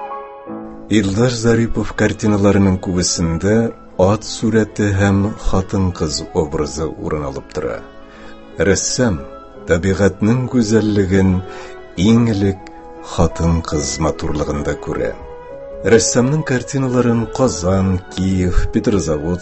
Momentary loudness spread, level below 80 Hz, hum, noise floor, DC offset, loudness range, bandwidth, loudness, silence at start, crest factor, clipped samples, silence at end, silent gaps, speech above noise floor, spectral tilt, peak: 15 LU; -30 dBFS; none; -35 dBFS; under 0.1%; 5 LU; 8.6 kHz; -17 LUFS; 0 s; 16 dB; under 0.1%; 0 s; none; 20 dB; -5.5 dB/octave; 0 dBFS